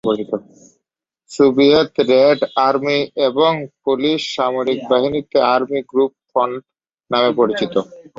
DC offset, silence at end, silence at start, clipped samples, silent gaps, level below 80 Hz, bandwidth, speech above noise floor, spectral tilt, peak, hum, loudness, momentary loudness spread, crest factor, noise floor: under 0.1%; 0.15 s; 0.05 s; under 0.1%; none; -58 dBFS; 8 kHz; 64 dB; -5.5 dB/octave; -2 dBFS; none; -16 LUFS; 9 LU; 16 dB; -80 dBFS